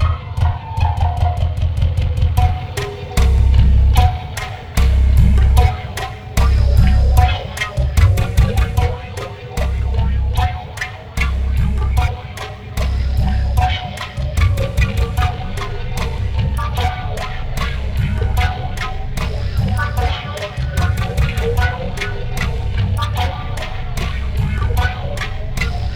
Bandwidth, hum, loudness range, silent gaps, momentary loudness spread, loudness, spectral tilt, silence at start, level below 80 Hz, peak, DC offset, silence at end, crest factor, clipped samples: 14 kHz; none; 6 LU; none; 11 LU; -18 LUFS; -6 dB/octave; 0 s; -18 dBFS; 0 dBFS; under 0.1%; 0 s; 16 dB; under 0.1%